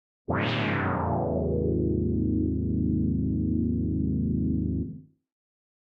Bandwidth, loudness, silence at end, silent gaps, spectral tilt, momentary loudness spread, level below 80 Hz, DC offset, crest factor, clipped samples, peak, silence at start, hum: 5.8 kHz; -27 LUFS; 0.95 s; none; -9.5 dB/octave; 3 LU; -38 dBFS; under 0.1%; 14 dB; under 0.1%; -14 dBFS; 0.3 s; none